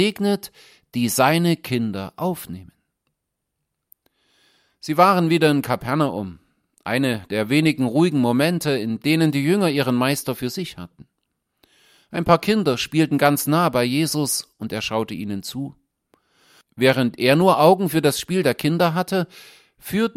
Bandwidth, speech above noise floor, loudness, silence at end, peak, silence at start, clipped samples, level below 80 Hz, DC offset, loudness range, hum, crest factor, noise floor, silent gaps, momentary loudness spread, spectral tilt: 16.5 kHz; 59 dB; -20 LUFS; 0.05 s; -2 dBFS; 0 s; under 0.1%; -56 dBFS; under 0.1%; 5 LU; none; 20 dB; -79 dBFS; none; 15 LU; -5 dB/octave